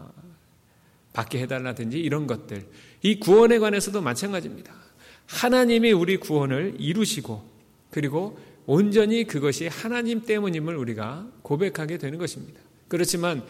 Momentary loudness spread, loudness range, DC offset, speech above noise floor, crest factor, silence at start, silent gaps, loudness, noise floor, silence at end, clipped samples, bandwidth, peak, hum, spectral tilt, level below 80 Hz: 16 LU; 6 LU; under 0.1%; 35 dB; 16 dB; 0 s; none; -24 LUFS; -59 dBFS; 0 s; under 0.1%; 16.5 kHz; -8 dBFS; none; -5 dB/octave; -62 dBFS